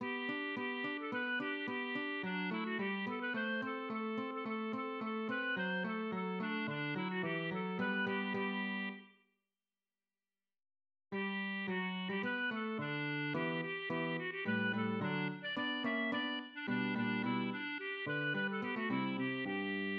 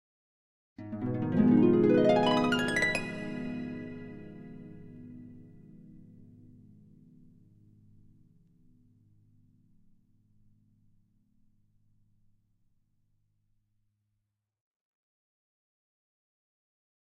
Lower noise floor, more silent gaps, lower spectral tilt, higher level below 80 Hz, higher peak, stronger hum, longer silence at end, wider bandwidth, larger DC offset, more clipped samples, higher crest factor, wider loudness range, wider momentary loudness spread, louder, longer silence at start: first, under -90 dBFS vs -83 dBFS; neither; second, -3.5 dB/octave vs -6.5 dB/octave; second, -88 dBFS vs -60 dBFS; second, -24 dBFS vs -12 dBFS; neither; second, 0 s vs 11.2 s; second, 5.6 kHz vs 12.5 kHz; neither; neither; second, 14 dB vs 22 dB; second, 4 LU vs 24 LU; second, 4 LU vs 26 LU; second, -38 LUFS vs -27 LUFS; second, 0 s vs 0.8 s